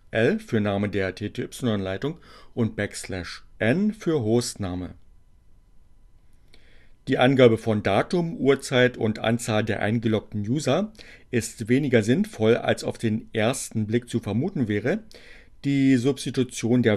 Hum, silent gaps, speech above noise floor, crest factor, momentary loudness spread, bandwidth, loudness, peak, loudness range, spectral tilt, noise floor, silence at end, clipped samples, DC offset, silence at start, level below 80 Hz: none; none; 29 dB; 20 dB; 11 LU; 13 kHz; -24 LUFS; -4 dBFS; 6 LU; -6 dB/octave; -53 dBFS; 0 s; under 0.1%; under 0.1%; 0.15 s; -52 dBFS